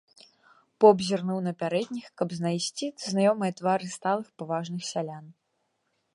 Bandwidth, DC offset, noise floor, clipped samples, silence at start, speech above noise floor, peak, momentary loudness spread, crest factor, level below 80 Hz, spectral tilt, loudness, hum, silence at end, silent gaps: 11.5 kHz; under 0.1%; -76 dBFS; under 0.1%; 0.8 s; 49 dB; -6 dBFS; 13 LU; 22 dB; -76 dBFS; -5.5 dB/octave; -27 LUFS; none; 0.85 s; none